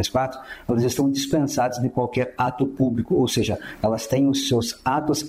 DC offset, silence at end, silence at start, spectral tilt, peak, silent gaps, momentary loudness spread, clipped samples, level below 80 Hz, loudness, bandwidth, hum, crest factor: under 0.1%; 0 s; 0 s; -5 dB/octave; -8 dBFS; none; 5 LU; under 0.1%; -48 dBFS; -23 LUFS; 16 kHz; none; 14 dB